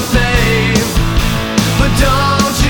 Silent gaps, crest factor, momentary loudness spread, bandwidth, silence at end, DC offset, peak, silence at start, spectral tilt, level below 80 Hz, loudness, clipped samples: none; 12 dB; 3 LU; 18 kHz; 0 s; under 0.1%; 0 dBFS; 0 s; -4.5 dB/octave; -18 dBFS; -12 LUFS; under 0.1%